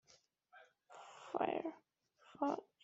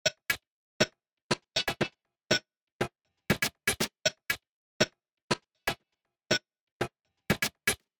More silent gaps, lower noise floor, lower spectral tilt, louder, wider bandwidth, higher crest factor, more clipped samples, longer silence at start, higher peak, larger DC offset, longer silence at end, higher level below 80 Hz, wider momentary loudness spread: second, none vs 0.47-0.80 s, 1.13-1.30 s, 2.57-2.80 s, 4.52-4.80 s, 5.22-5.28 s, 6.61-6.80 s; second, -72 dBFS vs -82 dBFS; about the same, -3.5 dB/octave vs -3 dB/octave; second, -42 LUFS vs -32 LUFS; second, 8 kHz vs over 20 kHz; about the same, 24 dB vs 24 dB; neither; first, 0.55 s vs 0.05 s; second, -22 dBFS vs -10 dBFS; neither; about the same, 0.2 s vs 0.25 s; second, -88 dBFS vs -58 dBFS; first, 25 LU vs 8 LU